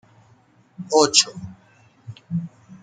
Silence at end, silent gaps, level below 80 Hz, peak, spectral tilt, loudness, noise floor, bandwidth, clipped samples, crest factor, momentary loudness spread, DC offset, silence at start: 0.05 s; none; -64 dBFS; 0 dBFS; -2.5 dB/octave; -19 LUFS; -56 dBFS; 9.6 kHz; under 0.1%; 24 dB; 27 LU; under 0.1%; 0.8 s